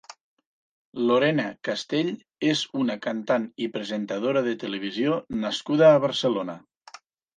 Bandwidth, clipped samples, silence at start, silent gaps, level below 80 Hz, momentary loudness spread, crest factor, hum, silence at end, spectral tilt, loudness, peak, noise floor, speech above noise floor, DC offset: 9.6 kHz; under 0.1%; 0.1 s; 0.21-0.37 s, 0.46-0.92 s; -68 dBFS; 12 LU; 20 dB; none; 0.8 s; -5.5 dB/octave; -25 LUFS; -6 dBFS; -50 dBFS; 26 dB; under 0.1%